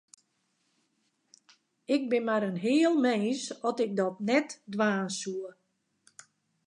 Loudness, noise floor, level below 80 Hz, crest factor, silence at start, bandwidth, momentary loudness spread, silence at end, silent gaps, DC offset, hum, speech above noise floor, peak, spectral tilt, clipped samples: -29 LUFS; -76 dBFS; -84 dBFS; 18 dB; 1.9 s; 11 kHz; 12 LU; 1.15 s; none; under 0.1%; none; 47 dB; -14 dBFS; -5 dB/octave; under 0.1%